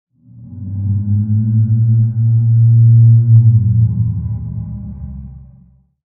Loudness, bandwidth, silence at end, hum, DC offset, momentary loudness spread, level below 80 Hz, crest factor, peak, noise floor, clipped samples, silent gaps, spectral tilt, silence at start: -12 LUFS; 0.9 kHz; 0.7 s; none; under 0.1%; 19 LU; -36 dBFS; 12 dB; 0 dBFS; -46 dBFS; under 0.1%; none; -17.5 dB/octave; 0.35 s